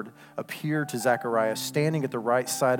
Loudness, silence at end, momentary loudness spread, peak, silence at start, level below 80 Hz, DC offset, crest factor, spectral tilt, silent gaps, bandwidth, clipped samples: -27 LUFS; 0 s; 11 LU; -10 dBFS; 0 s; -78 dBFS; under 0.1%; 16 dB; -5 dB/octave; none; 18 kHz; under 0.1%